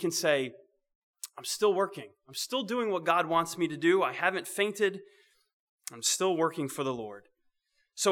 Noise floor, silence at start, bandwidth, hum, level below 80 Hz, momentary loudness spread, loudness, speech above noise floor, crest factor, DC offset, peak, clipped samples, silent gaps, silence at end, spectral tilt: -75 dBFS; 0 s; 19 kHz; none; -80 dBFS; 18 LU; -30 LUFS; 45 dB; 20 dB; under 0.1%; -10 dBFS; under 0.1%; 0.95-1.14 s, 5.53-5.78 s; 0 s; -3 dB/octave